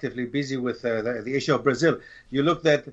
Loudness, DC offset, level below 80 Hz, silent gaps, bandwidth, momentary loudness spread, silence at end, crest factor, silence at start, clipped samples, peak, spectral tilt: -25 LUFS; under 0.1%; -58 dBFS; none; 8.2 kHz; 7 LU; 0 s; 18 dB; 0 s; under 0.1%; -8 dBFS; -5.5 dB/octave